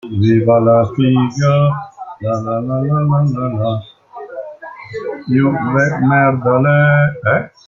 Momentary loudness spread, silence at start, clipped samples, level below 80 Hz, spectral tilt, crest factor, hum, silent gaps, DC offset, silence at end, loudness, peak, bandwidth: 18 LU; 0.05 s; under 0.1%; -50 dBFS; -8.5 dB/octave; 12 dB; none; none; under 0.1%; 0.2 s; -14 LUFS; -2 dBFS; 7.2 kHz